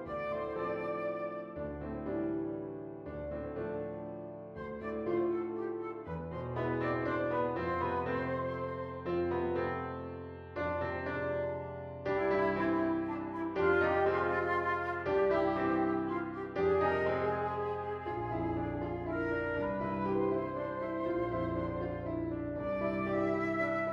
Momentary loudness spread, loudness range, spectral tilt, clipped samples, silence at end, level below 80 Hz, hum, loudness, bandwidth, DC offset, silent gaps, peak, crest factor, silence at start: 10 LU; 7 LU; -9 dB/octave; under 0.1%; 0 s; -56 dBFS; none; -35 LUFS; 6.4 kHz; under 0.1%; none; -18 dBFS; 16 dB; 0 s